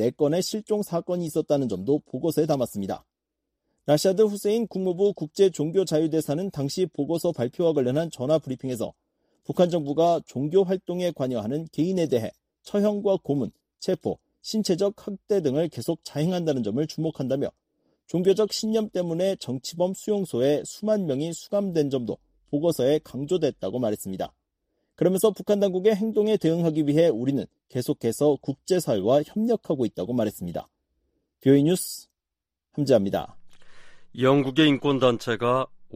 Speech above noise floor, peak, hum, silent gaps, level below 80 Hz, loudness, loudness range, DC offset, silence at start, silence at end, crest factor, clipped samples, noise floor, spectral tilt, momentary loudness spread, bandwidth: 63 dB; -6 dBFS; none; none; -62 dBFS; -25 LUFS; 3 LU; under 0.1%; 0 s; 0 s; 18 dB; under 0.1%; -87 dBFS; -6 dB/octave; 10 LU; 15.5 kHz